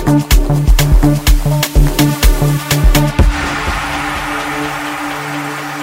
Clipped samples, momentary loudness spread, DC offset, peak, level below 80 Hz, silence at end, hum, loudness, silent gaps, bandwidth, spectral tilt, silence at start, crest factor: under 0.1%; 8 LU; under 0.1%; 0 dBFS; -14 dBFS; 0 s; none; -14 LUFS; none; 16.5 kHz; -5 dB/octave; 0 s; 12 dB